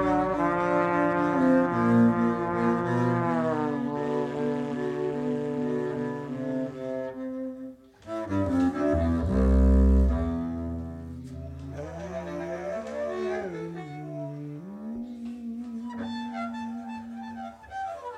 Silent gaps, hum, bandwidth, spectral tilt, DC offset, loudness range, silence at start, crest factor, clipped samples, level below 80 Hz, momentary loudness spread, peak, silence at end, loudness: none; none; 8.8 kHz; -8.5 dB/octave; under 0.1%; 12 LU; 0 s; 18 dB; under 0.1%; -34 dBFS; 16 LU; -10 dBFS; 0 s; -28 LUFS